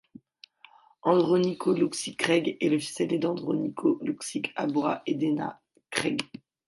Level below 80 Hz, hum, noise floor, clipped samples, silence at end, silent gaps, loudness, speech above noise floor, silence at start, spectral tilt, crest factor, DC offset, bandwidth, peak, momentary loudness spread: -72 dBFS; none; -57 dBFS; under 0.1%; 0.4 s; none; -27 LUFS; 30 dB; 1.05 s; -5 dB/octave; 20 dB; under 0.1%; 11.5 kHz; -8 dBFS; 7 LU